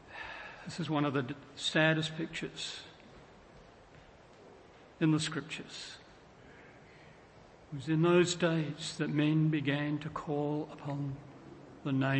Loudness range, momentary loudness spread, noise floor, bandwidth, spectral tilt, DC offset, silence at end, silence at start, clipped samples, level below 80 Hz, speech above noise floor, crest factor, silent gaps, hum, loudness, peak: 7 LU; 18 LU; -57 dBFS; 8.8 kHz; -5.5 dB/octave; under 0.1%; 0 s; 0 s; under 0.1%; -68 dBFS; 25 dB; 22 dB; none; none; -33 LUFS; -12 dBFS